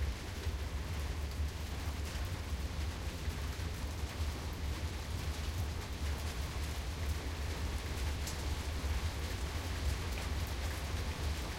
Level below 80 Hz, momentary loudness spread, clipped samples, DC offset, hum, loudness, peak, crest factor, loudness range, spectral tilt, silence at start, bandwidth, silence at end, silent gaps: -40 dBFS; 2 LU; under 0.1%; under 0.1%; none; -40 LUFS; -24 dBFS; 14 dB; 2 LU; -4.5 dB/octave; 0 s; 16.5 kHz; 0 s; none